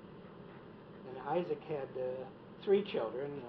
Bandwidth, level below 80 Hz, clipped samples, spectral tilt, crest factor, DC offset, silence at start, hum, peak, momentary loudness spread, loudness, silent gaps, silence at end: 5.4 kHz; -74 dBFS; under 0.1%; -5 dB/octave; 20 dB; under 0.1%; 0 s; none; -20 dBFS; 20 LU; -37 LUFS; none; 0 s